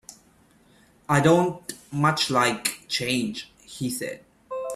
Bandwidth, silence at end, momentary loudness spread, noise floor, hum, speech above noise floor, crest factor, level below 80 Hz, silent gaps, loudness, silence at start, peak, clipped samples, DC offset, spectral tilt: 15.5 kHz; 0 s; 17 LU; -58 dBFS; none; 35 dB; 22 dB; -60 dBFS; none; -24 LUFS; 0.1 s; -4 dBFS; under 0.1%; under 0.1%; -4.5 dB/octave